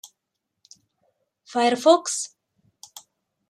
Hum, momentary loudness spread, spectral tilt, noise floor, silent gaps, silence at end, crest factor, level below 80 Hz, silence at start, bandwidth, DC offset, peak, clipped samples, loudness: none; 26 LU; -2 dB/octave; -81 dBFS; none; 1.25 s; 24 dB; -82 dBFS; 0.05 s; 15 kHz; under 0.1%; -2 dBFS; under 0.1%; -21 LUFS